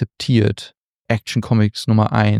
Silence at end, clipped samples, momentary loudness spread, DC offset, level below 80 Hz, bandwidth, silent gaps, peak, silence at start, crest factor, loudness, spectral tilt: 0 s; under 0.1%; 8 LU; under 0.1%; -48 dBFS; 12 kHz; 0.77-1.03 s; -4 dBFS; 0 s; 14 dB; -18 LUFS; -7 dB/octave